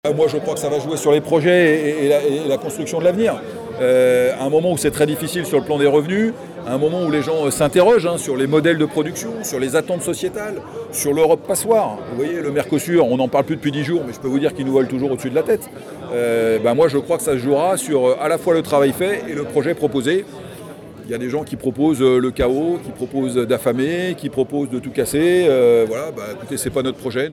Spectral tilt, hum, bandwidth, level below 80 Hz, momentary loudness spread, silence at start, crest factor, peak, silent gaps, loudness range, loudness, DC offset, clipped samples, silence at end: -5 dB/octave; none; 17 kHz; -50 dBFS; 10 LU; 0.05 s; 14 dB; -4 dBFS; none; 3 LU; -18 LUFS; under 0.1%; under 0.1%; 0 s